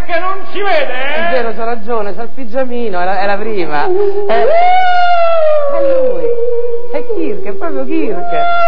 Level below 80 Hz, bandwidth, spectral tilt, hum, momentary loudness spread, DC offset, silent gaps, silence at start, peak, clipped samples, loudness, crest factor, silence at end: -50 dBFS; 5.4 kHz; -7.5 dB/octave; none; 10 LU; 50%; none; 0 s; 0 dBFS; under 0.1%; -14 LUFS; 10 dB; 0 s